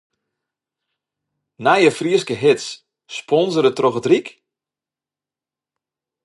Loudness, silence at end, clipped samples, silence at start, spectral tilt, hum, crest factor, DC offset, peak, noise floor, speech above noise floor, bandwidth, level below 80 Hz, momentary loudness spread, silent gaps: -17 LUFS; 1.95 s; under 0.1%; 1.6 s; -5 dB/octave; none; 20 dB; under 0.1%; -2 dBFS; -89 dBFS; 73 dB; 11.5 kHz; -70 dBFS; 17 LU; none